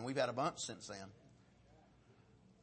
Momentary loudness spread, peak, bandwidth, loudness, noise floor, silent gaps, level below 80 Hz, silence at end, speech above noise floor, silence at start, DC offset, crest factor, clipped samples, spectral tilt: 15 LU; -24 dBFS; 8.4 kHz; -41 LUFS; -67 dBFS; none; -76 dBFS; 1.35 s; 26 dB; 0 s; under 0.1%; 22 dB; under 0.1%; -4 dB/octave